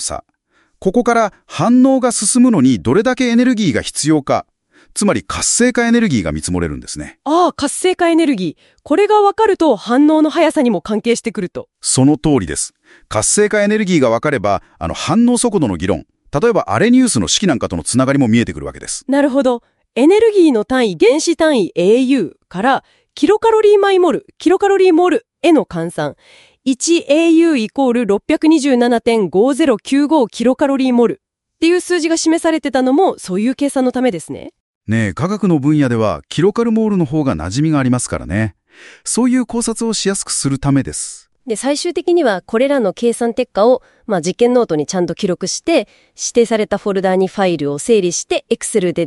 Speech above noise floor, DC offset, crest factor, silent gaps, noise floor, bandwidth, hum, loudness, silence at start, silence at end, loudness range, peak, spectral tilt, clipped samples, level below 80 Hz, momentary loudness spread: 45 dB; under 0.1%; 14 dB; 34.60-34.81 s; -59 dBFS; 12 kHz; none; -14 LUFS; 0 s; 0 s; 3 LU; 0 dBFS; -4.5 dB/octave; under 0.1%; -44 dBFS; 9 LU